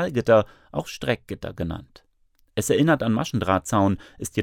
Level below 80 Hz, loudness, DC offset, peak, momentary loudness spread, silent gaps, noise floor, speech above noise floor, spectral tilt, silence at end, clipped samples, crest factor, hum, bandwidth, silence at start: -50 dBFS; -23 LUFS; under 0.1%; -4 dBFS; 12 LU; none; -63 dBFS; 39 dB; -5.5 dB/octave; 0 s; under 0.1%; 18 dB; none; 18 kHz; 0 s